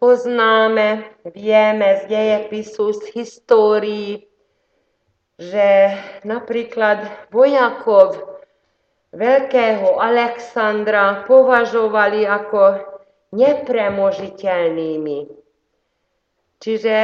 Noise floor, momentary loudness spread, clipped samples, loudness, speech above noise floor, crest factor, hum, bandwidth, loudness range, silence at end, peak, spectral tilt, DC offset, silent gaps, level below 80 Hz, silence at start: -70 dBFS; 14 LU; under 0.1%; -16 LUFS; 54 dB; 16 dB; none; 7.2 kHz; 5 LU; 0 s; 0 dBFS; -5.5 dB/octave; under 0.1%; none; -68 dBFS; 0 s